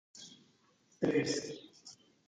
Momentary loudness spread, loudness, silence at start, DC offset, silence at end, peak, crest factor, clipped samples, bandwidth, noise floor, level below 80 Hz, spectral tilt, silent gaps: 22 LU; -35 LUFS; 0.15 s; under 0.1%; 0.35 s; -18 dBFS; 22 dB; under 0.1%; 9.4 kHz; -70 dBFS; -76 dBFS; -4.5 dB/octave; none